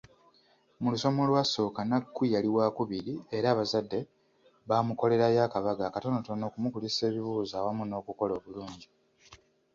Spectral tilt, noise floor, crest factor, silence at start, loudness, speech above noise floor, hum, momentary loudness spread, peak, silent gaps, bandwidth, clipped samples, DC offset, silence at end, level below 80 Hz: -6 dB/octave; -66 dBFS; 18 dB; 0.8 s; -30 LUFS; 36 dB; none; 11 LU; -12 dBFS; none; 7.6 kHz; under 0.1%; under 0.1%; 0.4 s; -66 dBFS